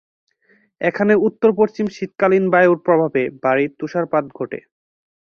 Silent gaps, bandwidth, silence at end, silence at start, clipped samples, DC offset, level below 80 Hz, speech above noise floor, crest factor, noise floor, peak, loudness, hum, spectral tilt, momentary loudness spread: none; 6.8 kHz; 0.65 s; 0.8 s; under 0.1%; under 0.1%; -62 dBFS; 42 dB; 18 dB; -59 dBFS; -2 dBFS; -17 LUFS; none; -8 dB/octave; 10 LU